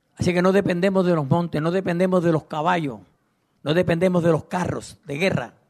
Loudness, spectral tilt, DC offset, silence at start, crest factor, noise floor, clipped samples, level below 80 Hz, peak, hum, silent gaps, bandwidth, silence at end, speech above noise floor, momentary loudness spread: -21 LUFS; -7 dB/octave; under 0.1%; 0.2 s; 16 dB; -67 dBFS; under 0.1%; -54 dBFS; -6 dBFS; none; none; 13.5 kHz; 0.2 s; 46 dB; 9 LU